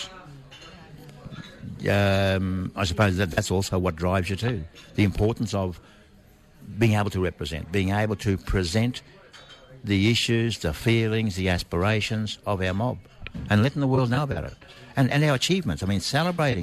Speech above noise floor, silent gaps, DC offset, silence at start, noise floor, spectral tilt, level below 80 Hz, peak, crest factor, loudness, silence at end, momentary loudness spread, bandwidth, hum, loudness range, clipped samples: 29 dB; none; under 0.1%; 0 s; -53 dBFS; -5.5 dB/octave; -44 dBFS; -10 dBFS; 14 dB; -25 LUFS; 0 s; 18 LU; 13.5 kHz; none; 3 LU; under 0.1%